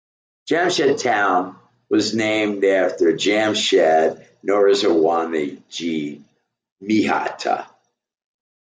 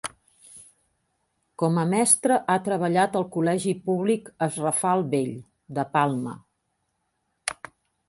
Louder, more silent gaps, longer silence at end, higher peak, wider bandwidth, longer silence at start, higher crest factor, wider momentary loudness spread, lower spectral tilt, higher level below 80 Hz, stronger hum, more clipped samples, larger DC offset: first, -19 LUFS vs -24 LUFS; first, 6.72-6.76 s vs none; first, 1.05 s vs 0.55 s; about the same, -4 dBFS vs -4 dBFS; second, 9.4 kHz vs 12 kHz; first, 0.45 s vs 0.05 s; second, 16 dB vs 22 dB; second, 11 LU vs 14 LU; about the same, -3.5 dB/octave vs -4.5 dB/octave; about the same, -68 dBFS vs -68 dBFS; neither; neither; neither